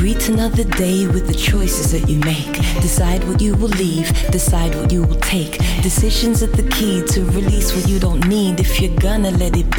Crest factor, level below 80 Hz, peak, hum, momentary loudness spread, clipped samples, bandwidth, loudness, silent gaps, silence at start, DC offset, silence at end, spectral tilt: 10 dB; -18 dBFS; -6 dBFS; none; 2 LU; under 0.1%; 19 kHz; -17 LUFS; none; 0 s; under 0.1%; 0 s; -5 dB/octave